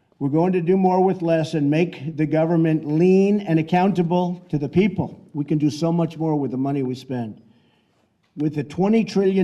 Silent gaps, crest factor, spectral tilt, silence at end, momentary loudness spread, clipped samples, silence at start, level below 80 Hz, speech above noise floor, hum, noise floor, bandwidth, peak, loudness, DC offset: none; 14 dB; -8.5 dB/octave; 0 s; 9 LU; under 0.1%; 0.2 s; -62 dBFS; 44 dB; none; -64 dBFS; 10 kHz; -6 dBFS; -21 LUFS; under 0.1%